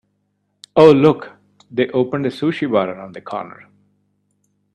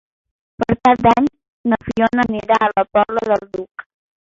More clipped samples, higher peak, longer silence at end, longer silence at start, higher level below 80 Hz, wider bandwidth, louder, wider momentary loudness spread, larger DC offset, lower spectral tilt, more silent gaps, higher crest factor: neither; about the same, 0 dBFS vs -2 dBFS; first, 1.25 s vs 0.55 s; first, 0.75 s vs 0.6 s; second, -58 dBFS vs -46 dBFS; first, 9.2 kHz vs 7.6 kHz; about the same, -16 LUFS vs -17 LUFS; first, 19 LU vs 14 LU; neither; about the same, -7.5 dB/octave vs -7 dB/octave; second, none vs 1.48-1.64 s, 3.71-3.75 s; about the same, 18 dB vs 16 dB